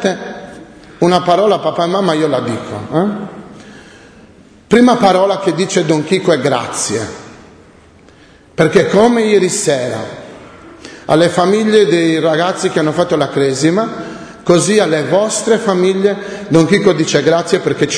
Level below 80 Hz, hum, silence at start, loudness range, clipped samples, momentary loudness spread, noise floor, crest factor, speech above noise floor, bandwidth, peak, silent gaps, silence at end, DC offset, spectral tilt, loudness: -50 dBFS; none; 0 s; 3 LU; under 0.1%; 15 LU; -43 dBFS; 14 dB; 31 dB; 11 kHz; 0 dBFS; none; 0 s; under 0.1%; -5 dB/octave; -13 LUFS